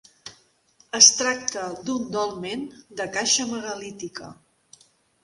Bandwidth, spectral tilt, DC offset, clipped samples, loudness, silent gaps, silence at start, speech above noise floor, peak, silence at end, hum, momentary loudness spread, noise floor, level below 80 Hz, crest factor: 11.5 kHz; -0.5 dB/octave; under 0.1%; under 0.1%; -21 LUFS; none; 0.25 s; 37 dB; 0 dBFS; 0.9 s; none; 22 LU; -61 dBFS; -66 dBFS; 26 dB